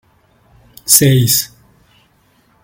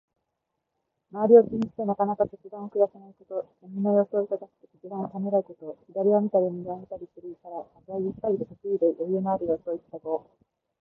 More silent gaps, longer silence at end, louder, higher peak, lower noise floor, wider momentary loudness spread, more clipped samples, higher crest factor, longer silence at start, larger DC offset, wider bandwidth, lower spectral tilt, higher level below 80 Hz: neither; first, 1.15 s vs 0.6 s; first, -10 LUFS vs -26 LUFS; first, 0 dBFS vs -4 dBFS; second, -54 dBFS vs -82 dBFS; about the same, 19 LU vs 18 LU; first, 0.1% vs under 0.1%; second, 16 dB vs 22 dB; second, 0.85 s vs 1.15 s; neither; first, 17 kHz vs 3.4 kHz; second, -3.5 dB/octave vs -11.5 dB/octave; first, -48 dBFS vs -68 dBFS